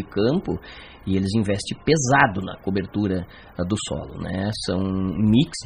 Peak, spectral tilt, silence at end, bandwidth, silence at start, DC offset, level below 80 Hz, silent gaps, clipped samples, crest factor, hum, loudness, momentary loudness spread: 0 dBFS; -5.5 dB/octave; 0 s; 11.5 kHz; 0 s; under 0.1%; -44 dBFS; none; under 0.1%; 22 dB; none; -23 LUFS; 12 LU